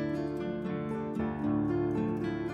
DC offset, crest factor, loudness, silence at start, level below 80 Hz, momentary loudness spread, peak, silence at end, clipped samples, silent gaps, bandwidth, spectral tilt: under 0.1%; 12 dB; -33 LUFS; 0 s; -56 dBFS; 5 LU; -20 dBFS; 0 s; under 0.1%; none; 8.4 kHz; -9 dB/octave